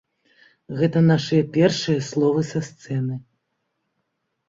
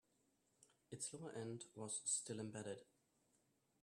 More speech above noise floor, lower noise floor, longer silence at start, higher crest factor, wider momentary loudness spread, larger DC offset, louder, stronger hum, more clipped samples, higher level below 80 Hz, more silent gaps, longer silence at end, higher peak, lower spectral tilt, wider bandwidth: first, 55 dB vs 33 dB; second, -75 dBFS vs -82 dBFS; about the same, 0.7 s vs 0.6 s; about the same, 18 dB vs 22 dB; about the same, 12 LU vs 11 LU; neither; first, -21 LUFS vs -48 LUFS; neither; neither; first, -60 dBFS vs -90 dBFS; neither; first, 1.3 s vs 1 s; first, -6 dBFS vs -30 dBFS; first, -6.5 dB/octave vs -3.5 dB/octave; second, 7.8 kHz vs 13 kHz